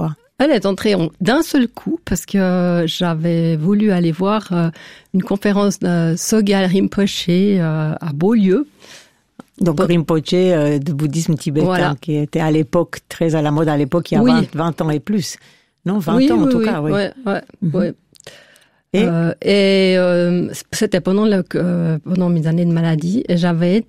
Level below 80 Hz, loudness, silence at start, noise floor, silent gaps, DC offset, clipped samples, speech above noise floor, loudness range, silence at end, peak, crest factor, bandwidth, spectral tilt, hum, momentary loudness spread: -46 dBFS; -16 LUFS; 0 s; -52 dBFS; none; 0.6%; under 0.1%; 36 dB; 2 LU; 0.05 s; -2 dBFS; 14 dB; 15.5 kHz; -6.5 dB/octave; none; 7 LU